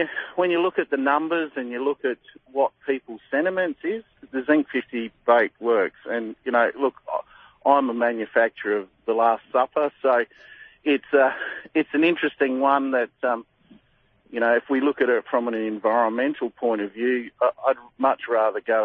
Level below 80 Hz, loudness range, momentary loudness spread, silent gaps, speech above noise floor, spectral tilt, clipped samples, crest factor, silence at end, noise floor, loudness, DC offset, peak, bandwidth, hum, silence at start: -70 dBFS; 3 LU; 9 LU; none; 39 dB; -8 dB/octave; under 0.1%; 18 dB; 0 s; -62 dBFS; -23 LUFS; under 0.1%; -4 dBFS; 4.7 kHz; none; 0 s